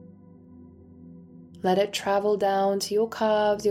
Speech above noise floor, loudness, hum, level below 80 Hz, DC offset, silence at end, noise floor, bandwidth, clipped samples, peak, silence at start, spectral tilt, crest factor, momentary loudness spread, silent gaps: 26 dB; -25 LUFS; 50 Hz at -50 dBFS; -64 dBFS; under 0.1%; 0 s; -49 dBFS; 16 kHz; under 0.1%; -10 dBFS; 0 s; -4.5 dB/octave; 16 dB; 3 LU; none